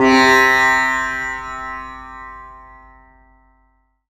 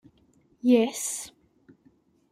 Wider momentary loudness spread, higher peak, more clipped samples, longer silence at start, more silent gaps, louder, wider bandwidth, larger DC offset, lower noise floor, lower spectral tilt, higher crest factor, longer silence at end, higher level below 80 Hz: first, 24 LU vs 14 LU; first, 0 dBFS vs -8 dBFS; neither; second, 0 s vs 0.65 s; neither; first, -14 LUFS vs -25 LUFS; second, 14 kHz vs 16 kHz; neither; about the same, -61 dBFS vs -63 dBFS; about the same, -3 dB/octave vs -3.5 dB/octave; about the same, 18 dB vs 20 dB; first, 1.5 s vs 1.05 s; first, -44 dBFS vs -72 dBFS